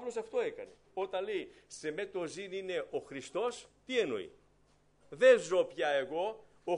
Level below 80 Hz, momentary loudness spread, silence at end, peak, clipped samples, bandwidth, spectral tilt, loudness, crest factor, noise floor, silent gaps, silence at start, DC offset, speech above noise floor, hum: -74 dBFS; 18 LU; 0 s; -14 dBFS; under 0.1%; 10.5 kHz; -3.5 dB/octave; -34 LUFS; 22 dB; -68 dBFS; none; 0 s; under 0.1%; 34 dB; 50 Hz at -75 dBFS